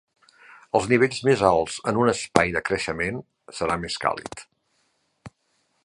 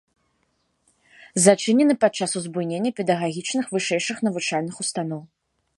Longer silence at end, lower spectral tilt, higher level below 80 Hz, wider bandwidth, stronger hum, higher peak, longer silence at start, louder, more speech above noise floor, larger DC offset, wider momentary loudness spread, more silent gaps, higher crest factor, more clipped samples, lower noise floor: about the same, 0.55 s vs 0.55 s; about the same, -5 dB/octave vs -4 dB/octave; first, -52 dBFS vs -72 dBFS; about the same, 11.5 kHz vs 11.5 kHz; neither; about the same, 0 dBFS vs 0 dBFS; second, 0.75 s vs 1.35 s; about the same, -23 LUFS vs -22 LUFS; about the same, 47 dB vs 48 dB; neither; first, 14 LU vs 10 LU; neither; about the same, 24 dB vs 22 dB; neither; about the same, -70 dBFS vs -70 dBFS